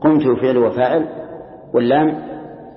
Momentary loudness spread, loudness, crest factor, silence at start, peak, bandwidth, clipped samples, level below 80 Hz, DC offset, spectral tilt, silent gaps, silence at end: 18 LU; -16 LUFS; 16 dB; 0 s; -2 dBFS; 5.6 kHz; under 0.1%; -54 dBFS; under 0.1%; -12 dB/octave; none; 0.05 s